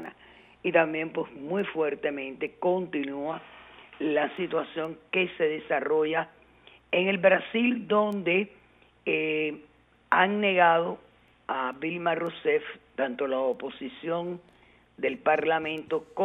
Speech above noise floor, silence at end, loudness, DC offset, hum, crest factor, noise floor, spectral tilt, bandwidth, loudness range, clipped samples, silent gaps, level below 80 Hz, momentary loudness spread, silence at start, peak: 29 dB; 0 s; -28 LUFS; under 0.1%; none; 22 dB; -56 dBFS; -7.5 dB/octave; 4 kHz; 4 LU; under 0.1%; none; -70 dBFS; 13 LU; 0 s; -6 dBFS